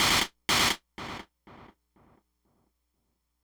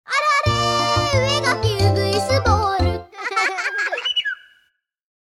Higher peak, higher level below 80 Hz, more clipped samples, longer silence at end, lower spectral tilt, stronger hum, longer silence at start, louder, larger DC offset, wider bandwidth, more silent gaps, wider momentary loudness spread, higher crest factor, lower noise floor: second, -12 dBFS vs -2 dBFS; second, -54 dBFS vs -36 dBFS; neither; first, 1.8 s vs 1 s; second, -1 dB/octave vs -4 dB/octave; neither; about the same, 0 s vs 0.1 s; second, -25 LUFS vs -19 LUFS; neither; first, over 20 kHz vs 13.5 kHz; neither; first, 17 LU vs 6 LU; about the same, 20 dB vs 18 dB; first, -78 dBFS vs -64 dBFS